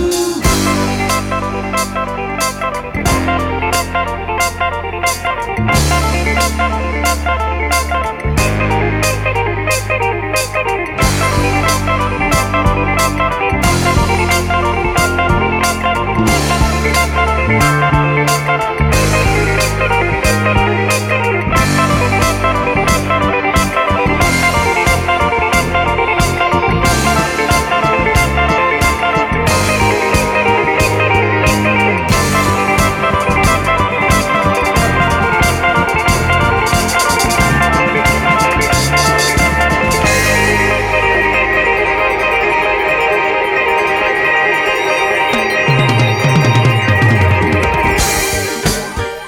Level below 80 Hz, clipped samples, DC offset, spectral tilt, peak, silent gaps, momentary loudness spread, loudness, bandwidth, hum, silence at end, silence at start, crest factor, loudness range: -24 dBFS; under 0.1%; under 0.1%; -4.5 dB/octave; 0 dBFS; none; 5 LU; -12 LUFS; 18.5 kHz; none; 0 s; 0 s; 12 dB; 4 LU